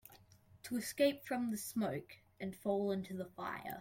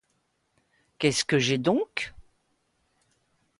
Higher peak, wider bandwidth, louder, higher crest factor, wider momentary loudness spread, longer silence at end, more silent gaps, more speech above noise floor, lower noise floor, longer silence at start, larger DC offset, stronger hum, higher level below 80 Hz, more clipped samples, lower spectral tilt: second, -20 dBFS vs -8 dBFS; first, 16.5 kHz vs 11.5 kHz; second, -39 LUFS vs -26 LUFS; about the same, 20 dB vs 22 dB; first, 13 LU vs 10 LU; second, 0 s vs 1.4 s; neither; second, 26 dB vs 48 dB; second, -64 dBFS vs -73 dBFS; second, 0.05 s vs 1 s; neither; neither; second, -74 dBFS vs -62 dBFS; neither; about the same, -5 dB/octave vs -4 dB/octave